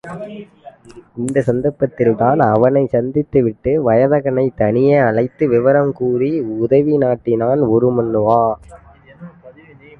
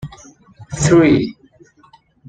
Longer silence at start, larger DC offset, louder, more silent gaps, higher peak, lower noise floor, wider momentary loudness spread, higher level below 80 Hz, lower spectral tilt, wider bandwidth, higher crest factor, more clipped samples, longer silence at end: about the same, 0.05 s vs 0.05 s; neither; about the same, -15 LUFS vs -14 LUFS; neither; about the same, 0 dBFS vs -2 dBFS; second, -42 dBFS vs -51 dBFS; second, 7 LU vs 21 LU; second, -48 dBFS vs -42 dBFS; first, -9 dB/octave vs -6 dB/octave; first, 11.5 kHz vs 9.4 kHz; about the same, 14 dB vs 16 dB; neither; second, 0.5 s vs 0.95 s